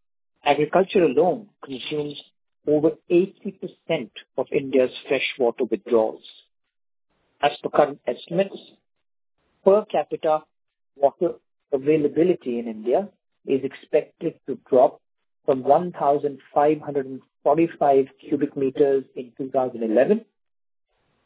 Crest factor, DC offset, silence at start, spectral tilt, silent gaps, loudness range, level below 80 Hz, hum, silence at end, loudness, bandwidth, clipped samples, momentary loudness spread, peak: 22 dB; under 0.1%; 0.45 s; -10 dB/octave; none; 3 LU; -68 dBFS; none; 1.05 s; -23 LUFS; 4 kHz; under 0.1%; 13 LU; -2 dBFS